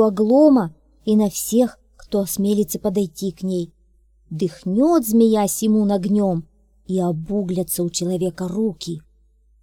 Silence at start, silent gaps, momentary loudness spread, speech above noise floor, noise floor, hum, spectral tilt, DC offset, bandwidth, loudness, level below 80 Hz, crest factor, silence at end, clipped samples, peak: 0 s; none; 11 LU; 38 dB; -56 dBFS; none; -6 dB/octave; under 0.1%; 19 kHz; -20 LUFS; -52 dBFS; 16 dB; 0.65 s; under 0.1%; -4 dBFS